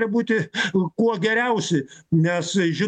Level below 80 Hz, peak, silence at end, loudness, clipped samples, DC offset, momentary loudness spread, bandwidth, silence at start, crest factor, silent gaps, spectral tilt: -64 dBFS; -8 dBFS; 0 s; -22 LUFS; under 0.1%; under 0.1%; 4 LU; 9.2 kHz; 0 s; 12 dB; none; -5.5 dB/octave